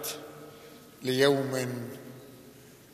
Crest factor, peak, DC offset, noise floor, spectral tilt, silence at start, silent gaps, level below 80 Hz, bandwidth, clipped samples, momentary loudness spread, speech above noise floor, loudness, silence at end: 22 dB; -10 dBFS; under 0.1%; -52 dBFS; -4.5 dB/octave; 0 s; none; -74 dBFS; 15 kHz; under 0.1%; 26 LU; 24 dB; -29 LUFS; 0.25 s